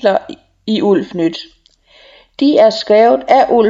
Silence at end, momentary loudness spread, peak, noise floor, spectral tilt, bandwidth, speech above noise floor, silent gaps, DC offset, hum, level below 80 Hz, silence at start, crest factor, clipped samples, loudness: 0 s; 14 LU; 0 dBFS; -48 dBFS; -6 dB/octave; 7.8 kHz; 37 dB; none; under 0.1%; none; -54 dBFS; 0.05 s; 12 dB; under 0.1%; -12 LUFS